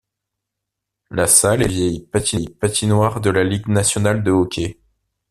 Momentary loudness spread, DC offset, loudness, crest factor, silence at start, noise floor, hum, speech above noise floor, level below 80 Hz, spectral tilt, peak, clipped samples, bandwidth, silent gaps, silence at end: 10 LU; under 0.1%; -17 LUFS; 18 dB; 1.1 s; -81 dBFS; none; 64 dB; -44 dBFS; -4 dB/octave; 0 dBFS; under 0.1%; 14.5 kHz; none; 0.6 s